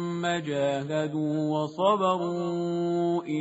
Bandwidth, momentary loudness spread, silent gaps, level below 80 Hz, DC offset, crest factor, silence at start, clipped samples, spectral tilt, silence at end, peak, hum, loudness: 8 kHz; 5 LU; none; -70 dBFS; under 0.1%; 16 dB; 0 s; under 0.1%; -5.5 dB/octave; 0 s; -10 dBFS; none; -27 LUFS